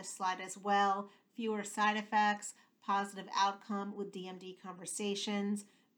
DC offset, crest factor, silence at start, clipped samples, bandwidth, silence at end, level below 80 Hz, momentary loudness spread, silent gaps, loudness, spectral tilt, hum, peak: under 0.1%; 18 dB; 0 s; under 0.1%; over 20 kHz; 0.3 s; under -90 dBFS; 15 LU; none; -36 LUFS; -3.5 dB/octave; none; -18 dBFS